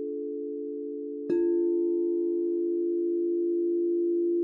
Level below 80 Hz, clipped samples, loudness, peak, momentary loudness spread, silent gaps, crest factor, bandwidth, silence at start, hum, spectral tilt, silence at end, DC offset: -78 dBFS; under 0.1%; -28 LUFS; -18 dBFS; 9 LU; none; 10 dB; 2.7 kHz; 0 s; none; -9 dB/octave; 0 s; under 0.1%